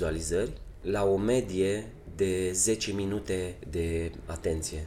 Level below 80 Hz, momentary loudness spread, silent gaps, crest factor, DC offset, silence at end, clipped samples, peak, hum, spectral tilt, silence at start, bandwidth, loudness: -44 dBFS; 9 LU; none; 16 dB; under 0.1%; 0 s; under 0.1%; -14 dBFS; none; -4.5 dB/octave; 0 s; 16 kHz; -30 LUFS